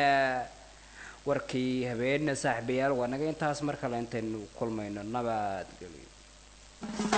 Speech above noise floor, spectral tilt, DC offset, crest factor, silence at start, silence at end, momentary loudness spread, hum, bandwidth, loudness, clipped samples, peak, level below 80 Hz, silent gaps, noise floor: 22 dB; -5 dB/octave; under 0.1%; 20 dB; 0 s; 0 s; 18 LU; 50 Hz at -55 dBFS; 9.2 kHz; -32 LUFS; under 0.1%; -12 dBFS; -58 dBFS; none; -54 dBFS